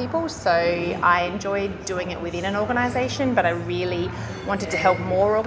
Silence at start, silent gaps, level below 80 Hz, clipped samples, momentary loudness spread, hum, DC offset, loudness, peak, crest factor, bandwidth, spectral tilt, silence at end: 0 s; none; -44 dBFS; under 0.1%; 8 LU; none; under 0.1%; -23 LUFS; -4 dBFS; 18 dB; 8 kHz; -5.5 dB/octave; 0 s